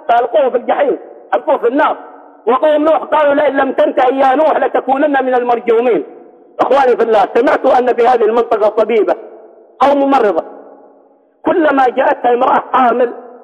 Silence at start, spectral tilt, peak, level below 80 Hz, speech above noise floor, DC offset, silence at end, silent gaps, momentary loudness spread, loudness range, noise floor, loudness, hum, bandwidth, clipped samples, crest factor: 0.1 s; -5.5 dB/octave; -2 dBFS; -58 dBFS; 37 dB; under 0.1%; 0.05 s; none; 7 LU; 2 LU; -48 dBFS; -12 LUFS; none; 8.4 kHz; under 0.1%; 10 dB